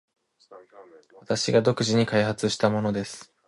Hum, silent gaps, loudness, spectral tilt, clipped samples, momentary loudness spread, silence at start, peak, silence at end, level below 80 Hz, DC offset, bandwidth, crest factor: none; none; -24 LUFS; -5 dB/octave; under 0.1%; 8 LU; 0.5 s; -6 dBFS; 0.25 s; -60 dBFS; under 0.1%; 11.5 kHz; 20 dB